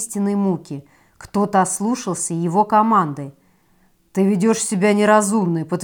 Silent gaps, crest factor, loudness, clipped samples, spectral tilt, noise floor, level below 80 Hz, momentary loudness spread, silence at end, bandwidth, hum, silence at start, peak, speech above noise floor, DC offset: none; 18 dB; -18 LUFS; under 0.1%; -5.5 dB/octave; -58 dBFS; -60 dBFS; 12 LU; 0 s; 18 kHz; none; 0 s; -2 dBFS; 40 dB; under 0.1%